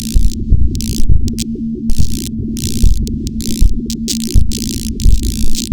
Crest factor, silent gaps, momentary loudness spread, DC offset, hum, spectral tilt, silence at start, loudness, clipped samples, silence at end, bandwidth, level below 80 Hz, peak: 12 dB; none; 5 LU; 10%; none; -5 dB/octave; 0 s; -17 LUFS; under 0.1%; 0 s; 19.5 kHz; -14 dBFS; 0 dBFS